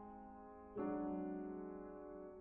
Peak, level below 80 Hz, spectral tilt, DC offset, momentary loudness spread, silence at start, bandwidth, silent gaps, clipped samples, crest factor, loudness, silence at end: -32 dBFS; -70 dBFS; -5.5 dB/octave; under 0.1%; 13 LU; 0 s; 3 kHz; none; under 0.1%; 16 dB; -48 LUFS; 0 s